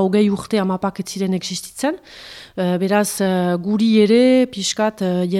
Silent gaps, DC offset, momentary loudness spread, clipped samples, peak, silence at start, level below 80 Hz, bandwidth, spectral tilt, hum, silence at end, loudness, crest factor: none; under 0.1%; 11 LU; under 0.1%; -4 dBFS; 0 s; -56 dBFS; 15 kHz; -5.5 dB/octave; none; 0 s; -18 LUFS; 14 dB